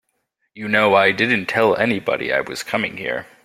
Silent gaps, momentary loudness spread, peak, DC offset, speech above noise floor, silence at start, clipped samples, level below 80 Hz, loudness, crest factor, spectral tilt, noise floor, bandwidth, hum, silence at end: none; 10 LU; 0 dBFS; under 0.1%; 52 dB; 0.55 s; under 0.1%; -58 dBFS; -18 LUFS; 18 dB; -4.5 dB/octave; -71 dBFS; 16 kHz; none; 0.2 s